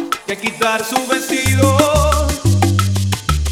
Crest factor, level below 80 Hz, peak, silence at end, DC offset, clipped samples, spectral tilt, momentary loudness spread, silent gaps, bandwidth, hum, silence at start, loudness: 16 dB; -24 dBFS; 0 dBFS; 0 s; under 0.1%; under 0.1%; -4.5 dB/octave; 6 LU; none; 16.5 kHz; none; 0 s; -15 LUFS